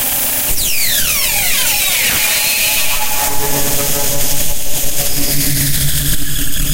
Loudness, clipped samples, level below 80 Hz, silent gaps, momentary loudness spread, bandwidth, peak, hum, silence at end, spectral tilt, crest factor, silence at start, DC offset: -13 LUFS; under 0.1%; -26 dBFS; none; 5 LU; 16.5 kHz; 0 dBFS; none; 0 s; -1.5 dB/octave; 12 dB; 0 s; under 0.1%